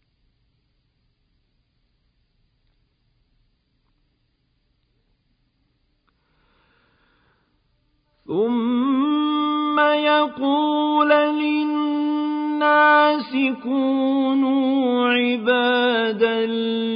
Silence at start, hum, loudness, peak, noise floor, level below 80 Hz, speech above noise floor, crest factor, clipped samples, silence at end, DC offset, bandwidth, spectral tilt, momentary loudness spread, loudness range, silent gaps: 8.3 s; none; -19 LUFS; -4 dBFS; -68 dBFS; -68 dBFS; 48 dB; 18 dB; under 0.1%; 0 s; under 0.1%; 5.2 kHz; -9 dB/octave; 6 LU; 7 LU; none